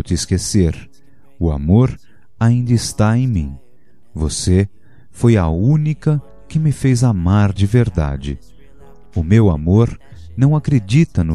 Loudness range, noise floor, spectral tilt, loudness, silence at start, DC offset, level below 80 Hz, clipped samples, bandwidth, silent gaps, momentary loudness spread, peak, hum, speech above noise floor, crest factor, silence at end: 2 LU; -55 dBFS; -7 dB/octave; -16 LUFS; 0.05 s; 1%; -30 dBFS; under 0.1%; 12.5 kHz; none; 11 LU; 0 dBFS; none; 41 dB; 16 dB; 0 s